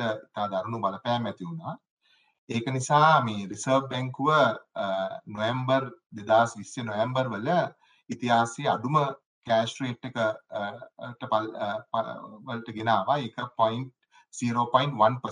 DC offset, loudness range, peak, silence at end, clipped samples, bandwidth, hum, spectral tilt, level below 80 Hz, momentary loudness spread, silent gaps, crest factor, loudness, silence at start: under 0.1%; 5 LU; -6 dBFS; 0 s; under 0.1%; 10.5 kHz; none; -5.5 dB/octave; -72 dBFS; 14 LU; 1.90-1.97 s, 2.38-2.47 s, 6.06-6.10 s, 9.26-9.42 s; 22 dB; -27 LUFS; 0 s